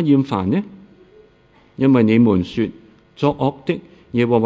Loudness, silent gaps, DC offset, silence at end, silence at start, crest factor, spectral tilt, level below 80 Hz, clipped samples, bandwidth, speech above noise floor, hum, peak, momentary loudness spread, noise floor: -18 LUFS; none; under 0.1%; 0 s; 0 s; 16 dB; -9 dB/octave; -46 dBFS; under 0.1%; 7.6 kHz; 36 dB; none; -2 dBFS; 12 LU; -52 dBFS